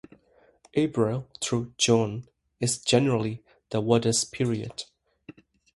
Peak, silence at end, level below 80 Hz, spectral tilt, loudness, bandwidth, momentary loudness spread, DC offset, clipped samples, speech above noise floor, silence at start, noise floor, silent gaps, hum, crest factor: -6 dBFS; 0.45 s; -60 dBFS; -4.5 dB/octave; -26 LUFS; 12 kHz; 14 LU; under 0.1%; under 0.1%; 36 dB; 0.75 s; -61 dBFS; none; none; 22 dB